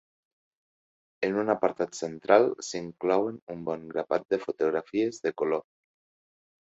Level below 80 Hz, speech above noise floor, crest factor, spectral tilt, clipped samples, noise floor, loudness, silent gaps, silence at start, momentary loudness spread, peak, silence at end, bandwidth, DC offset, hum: -72 dBFS; over 62 dB; 22 dB; -5 dB/octave; under 0.1%; under -90 dBFS; -28 LUFS; 3.42-3.47 s; 1.2 s; 12 LU; -6 dBFS; 1.1 s; 8 kHz; under 0.1%; none